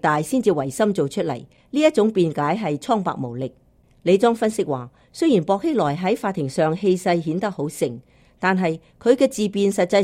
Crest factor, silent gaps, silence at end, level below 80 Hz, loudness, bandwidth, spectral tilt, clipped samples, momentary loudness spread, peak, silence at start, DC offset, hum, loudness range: 18 dB; none; 0 s; -58 dBFS; -21 LUFS; 16 kHz; -6 dB/octave; under 0.1%; 9 LU; -2 dBFS; 0.05 s; under 0.1%; none; 2 LU